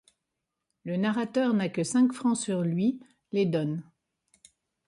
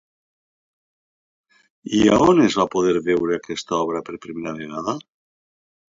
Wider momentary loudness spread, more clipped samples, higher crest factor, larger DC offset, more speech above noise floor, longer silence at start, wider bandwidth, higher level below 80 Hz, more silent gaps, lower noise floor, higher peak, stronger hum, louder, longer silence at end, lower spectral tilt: second, 9 LU vs 16 LU; neither; about the same, 16 dB vs 18 dB; neither; second, 58 dB vs over 71 dB; second, 0.85 s vs 1.85 s; first, 11.5 kHz vs 7.8 kHz; second, -72 dBFS vs -52 dBFS; neither; second, -84 dBFS vs under -90 dBFS; second, -14 dBFS vs -4 dBFS; neither; second, -28 LUFS vs -20 LUFS; about the same, 1.05 s vs 1 s; about the same, -6 dB/octave vs -5.5 dB/octave